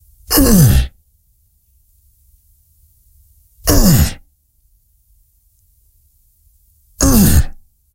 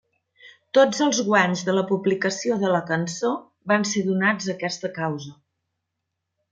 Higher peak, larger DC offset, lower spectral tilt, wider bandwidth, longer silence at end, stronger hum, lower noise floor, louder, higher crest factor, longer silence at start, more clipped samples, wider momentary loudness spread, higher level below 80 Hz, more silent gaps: first, 0 dBFS vs -4 dBFS; neither; about the same, -5 dB/octave vs -4.5 dB/octave; first, 17 kHz vs 9.4 kHz; second, 0.45 s vs 1.2 s; neither; second, -56 dBFS vs -81 dBFS; first, -13 LUFS vs -22 LUFS; about the same, 16 dB vs 20 dB; second, 0.3 s vs 0.45 s; neither; about the same, 11 LU vs 9 LU; first, -22 dBFS vs -70 dBFS; neither